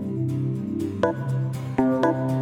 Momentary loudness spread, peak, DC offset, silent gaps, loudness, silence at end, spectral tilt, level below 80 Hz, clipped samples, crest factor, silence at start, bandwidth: 6 LU; -8 dBFS; under 0.1%; none; -25 LUFS; 0 s; -8.5 dB/octave; -58 dBFS; under 0.1%; 16 dB; 0 s; 11.5 kHz